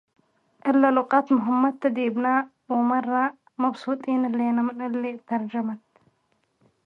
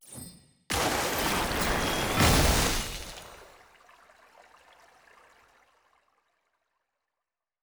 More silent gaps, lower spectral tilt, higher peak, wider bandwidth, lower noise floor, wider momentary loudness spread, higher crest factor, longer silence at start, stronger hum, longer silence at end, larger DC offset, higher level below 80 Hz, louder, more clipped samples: neither; first, -7.5 dB/octave vs -3.5 dB/octave; first, -6 dBFS vs -10 dBFS; second, 5 kHz vs over 20 kHz; second, -70 dBFS vs -89 dBFS; second, 9 LU vs 22 LU; about the same, 20 dB vs 22 dB; first, 0.65 s vs 0.1 s; neither; second, 1.1 s vs 4.2 s; neither; second, -78 dBFS vs -40 dBFS; about the same, -24 LUFS vs -26 LUFS; neither